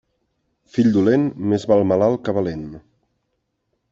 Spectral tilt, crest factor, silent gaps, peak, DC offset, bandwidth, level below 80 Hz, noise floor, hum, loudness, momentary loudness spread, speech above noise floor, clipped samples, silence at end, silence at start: -8 dB/octave; 18 dB; none; -4 dBFS; under 0.1%; 7.8 kHz; -56 dBFS; -73 dBFS; none; -19 LUFS; 11 LU; 55 dB; under 0.1%; 1.15 s; 0.75 s